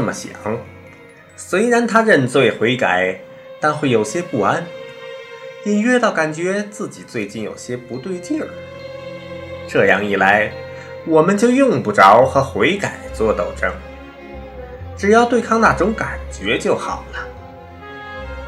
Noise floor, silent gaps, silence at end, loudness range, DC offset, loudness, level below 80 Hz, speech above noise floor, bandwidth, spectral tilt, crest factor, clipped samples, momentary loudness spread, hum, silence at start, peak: -42 dBFS; none; 0 s; 7 LU; under 0.1%; -16 LUFS; -40 dBFS; 26 dB; 13.5 kHz; -5 dB/octave; 18 dB; under 0.1%; 20 LU; none; 0 s; 0 dBFS